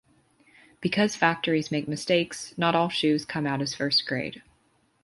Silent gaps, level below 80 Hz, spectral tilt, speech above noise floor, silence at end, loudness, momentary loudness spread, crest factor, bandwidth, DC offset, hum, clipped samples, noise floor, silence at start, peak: none; -64 dBFS; -4.5 dB/octave; 41 dB; 0.65 s; -26 LUFS; 8 LU; 22 dB; 11.5 kHz; under 0.1%; none; under 0.1%; -67 dBFS; 0.8 s; -6 dBFS